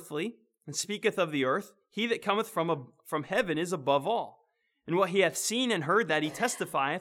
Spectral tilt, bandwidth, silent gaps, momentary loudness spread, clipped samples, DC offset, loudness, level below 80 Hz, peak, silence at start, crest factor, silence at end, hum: -3.5 dB/octave; 18 kHz; none; 10 LU; under 0.1%; under 0.1%; -30 LUFS; -74 dBFS; -12 dBFS; 0 s; 18 dB; 0 s; none